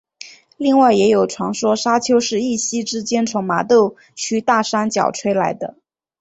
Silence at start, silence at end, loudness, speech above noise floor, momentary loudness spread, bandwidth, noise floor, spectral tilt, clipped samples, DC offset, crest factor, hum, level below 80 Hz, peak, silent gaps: 0.25 s; 0.5 s; -17 LUFS; 24 dB; 10 LU; 8.2 kHz; -41 dBFS; -4 dB/octave; under 0.1%; under 0.1%; 16 dB; none; -60 dBFS; -2 dBFS; none